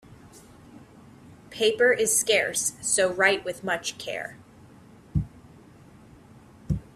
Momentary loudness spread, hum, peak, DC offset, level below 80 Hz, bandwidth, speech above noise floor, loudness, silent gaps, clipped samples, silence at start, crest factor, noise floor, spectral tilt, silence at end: 13 LU; none; -6 dBFS; under 0.1%; -48 dBFS; 15.5 kHz; 26 dB; -24 LUFS; none; under 0.1%; 0.35 s; 22 dB; -51 dBFS; -2.5 dB/octave; 0.15 s